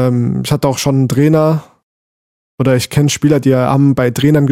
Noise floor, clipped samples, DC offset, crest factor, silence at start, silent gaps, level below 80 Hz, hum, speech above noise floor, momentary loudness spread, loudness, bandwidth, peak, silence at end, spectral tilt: under -90 dBFS; under 0.1%; 0.2%; 12 dB; 0 s; 1.83-2.58 s; -44 dBFS; none; over 79 dB; 4 LU; -13 LUFS; 16 kHz; 0 dBFS; 0 s; -6.5 dB/octave